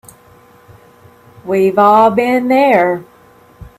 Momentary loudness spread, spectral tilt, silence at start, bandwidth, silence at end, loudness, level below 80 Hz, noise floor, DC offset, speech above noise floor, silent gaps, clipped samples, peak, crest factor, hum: 11 LU; -6.5 dB/octave; 1.45 s; 15.5 kHz; 0.1 s; -11 LUFS; -50 dBFS; -45 dBFS; under 0.1%; 34 dB; none; under 0.1%; 0 dBFS; 14 dB; none